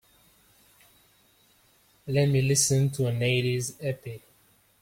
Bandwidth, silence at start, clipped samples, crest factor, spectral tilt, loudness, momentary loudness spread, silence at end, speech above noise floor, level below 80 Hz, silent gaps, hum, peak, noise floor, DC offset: 16.5 kHz; 2.05 s; under 0.1%; 20 dB; -4.5 dB/octave; -25 LUFS; 19 LU; 0.65 s; 38 dB; -60 dBFS; none; none; -10 dBFS; -63 dBFS; under 0.1%